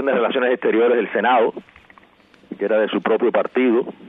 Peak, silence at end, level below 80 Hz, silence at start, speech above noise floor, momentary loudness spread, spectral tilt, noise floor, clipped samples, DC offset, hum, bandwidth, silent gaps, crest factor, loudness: -6 dBFS; 0 s; -68 dBFS; 0 s; 34 dB; 6 LU; -8 dB/octave; -52 dBFS; under 0.1%; under 0.1%; none; 3.9 kHz; none; 12 dB; -18 LUFS